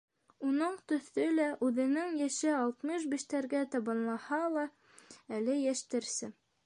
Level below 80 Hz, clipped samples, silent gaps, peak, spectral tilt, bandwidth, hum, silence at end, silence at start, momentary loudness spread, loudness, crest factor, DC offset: -86 dBFS; under 0.1%; none; -20 dBFS; -3.5 dB/octave; 11 kHz; none; 0.35 s; 0.4 s; 6 LU; -34 LUFS; 14 dB; under 0.1%